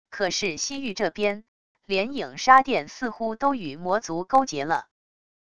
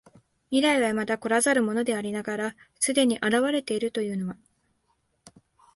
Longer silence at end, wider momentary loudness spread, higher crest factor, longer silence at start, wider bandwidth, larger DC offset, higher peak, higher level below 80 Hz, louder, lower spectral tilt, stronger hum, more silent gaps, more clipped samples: second, 0.7 s vs 1.4 s; first, 12 LU vs 9 LU; first, 24 dB vs 18 dB; second, 0.05 s vs 0.5 s; about the same, 11 kHz vs 12 kHz; first, 0.5% vs under 0.1%; first, -2 dBFS vs -10 dBFS; first, -60 dBFS vs -68 dBFS; about the same, -24 LUFS vs -25 LUFS; about the same, -3 dB/octave vs -3.5 dB/octave; neither; first, 1.48-1.75 s vs none; neither